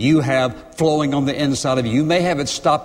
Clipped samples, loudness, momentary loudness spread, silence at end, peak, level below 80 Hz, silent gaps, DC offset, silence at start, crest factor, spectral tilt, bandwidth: under 0.1%; -18 LUFS; 3 LU; 0 s; -4 dBFS; -48 dBFS; none; under 0.1%; 0 s; 14 dB; -5.5 dB/octave; 15 kHz